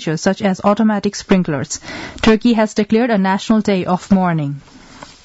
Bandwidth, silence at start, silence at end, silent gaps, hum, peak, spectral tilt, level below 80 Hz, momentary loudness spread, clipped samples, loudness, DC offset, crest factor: 8 kHz; 0 s; 0.2 s; none; none; -2 dBFS; -6 dB/octave; -42 dBFS; 10 LU; under 0.1%; -16 LUFS; under 0.1%; 14 dB